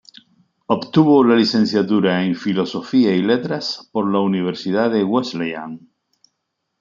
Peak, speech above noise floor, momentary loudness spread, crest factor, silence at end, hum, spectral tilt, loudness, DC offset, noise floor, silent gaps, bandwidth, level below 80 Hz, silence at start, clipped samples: -2 dBFS; 58 dB; 11 LU; 16 dB; 1.05 s; none; -7 dB/octave; -18 LUFS; under 0.1%; -75 dBFS; none; 7.4 kHz; -64 dBFS; 0.7 s; under 0.1%